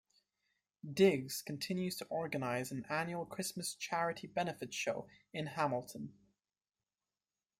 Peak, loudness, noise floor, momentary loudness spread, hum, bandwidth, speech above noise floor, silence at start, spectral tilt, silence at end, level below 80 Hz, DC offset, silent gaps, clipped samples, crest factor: -16 dBFS; -38 LUFS; under -90 dBFS; 14 LU; none; 16 kHz; over 52 dB; 0.85 s; -4.5 dB/octave; 1.5 s; -78 dBFS; under 0.1%; none; under 0.1%; 22 dB